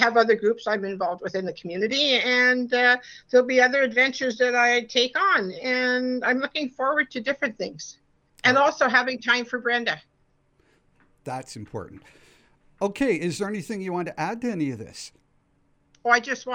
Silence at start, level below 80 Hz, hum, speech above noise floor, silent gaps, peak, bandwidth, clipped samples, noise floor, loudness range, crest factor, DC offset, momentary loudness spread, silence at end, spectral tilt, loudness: 0 s; -64 dBFS; none; 42 dB; none; -4 dBFS; 11 kHz; under 0.1%; -65 dBFS; 11 LU; 22 dB; under 0.1%; 16 LU; 0 s; -3.5 dB/octave; -23 LUFS